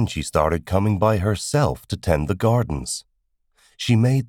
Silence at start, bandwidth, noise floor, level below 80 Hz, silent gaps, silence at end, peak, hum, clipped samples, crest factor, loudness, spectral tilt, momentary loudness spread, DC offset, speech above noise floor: 0 s; 16 kHz; -68 dBFS; -38 dBFS; none; 0 s; -4 dBFS; none; under 0.1%; 18 dB; -21 LUFS; -6 dB/octave; 8 LU; under 0.1%; 48 dB